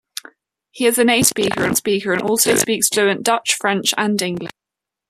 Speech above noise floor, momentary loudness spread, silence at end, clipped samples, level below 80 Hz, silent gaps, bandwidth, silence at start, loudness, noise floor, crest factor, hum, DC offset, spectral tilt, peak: 68 dB; 10 LU; 0.6 s; under 0.1%; -58 dBFS; none; 14.5 kHz; 0.75 s; -16 LUFS; -85 dBFS; 18 dB; none; under 0.1%; -2.5 dB/octave; 0 dBFS